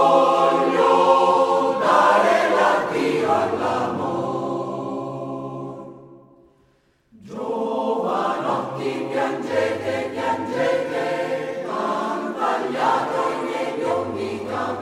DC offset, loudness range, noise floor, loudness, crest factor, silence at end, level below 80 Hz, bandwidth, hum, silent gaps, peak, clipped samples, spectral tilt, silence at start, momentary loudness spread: under 0.1%; 12 LU; -61 dBFS; -21 LUFS; 18 dB; 0 s; -64 dBFS; 13.5 kHz; none; none; -4 dBFS; under 0.1%; -5 dB/octave; 0 s; 12 LU